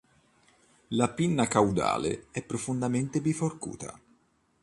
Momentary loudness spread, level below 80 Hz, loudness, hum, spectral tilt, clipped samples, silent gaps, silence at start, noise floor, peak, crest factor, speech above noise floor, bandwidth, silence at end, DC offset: 13 LU; -58 dBFS; -29 LUFS; none; -5.5 dB/octave; under 0.1%; none; 0.9 s; -68 dBFS; -8 dBFS; 22 dB; 40 dB; 11.5 kHz; 0.65 s; under 0.1%